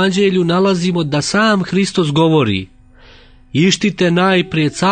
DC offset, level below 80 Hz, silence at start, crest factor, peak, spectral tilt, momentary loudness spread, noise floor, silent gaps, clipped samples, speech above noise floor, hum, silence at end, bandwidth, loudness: under 0.1%; -46 dBFS; 0 s; 14 dB; 0 dBFS; -5.5 dB/octave; 4 LU; -42 dBFS; none; under 0.1%; 29 dB; none; 0 s; 9.6 kHz; -14 LUFS